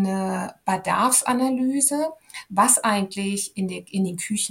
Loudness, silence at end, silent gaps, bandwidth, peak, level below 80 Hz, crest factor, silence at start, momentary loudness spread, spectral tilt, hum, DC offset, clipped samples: -22 LUFS; 0 s; none; 17 kHz; -4 dBFS; -66 dBFS; 18 dB; 0 s; 10 LU; -3.5 dB/octave; none; under 0.1%; under 0.1%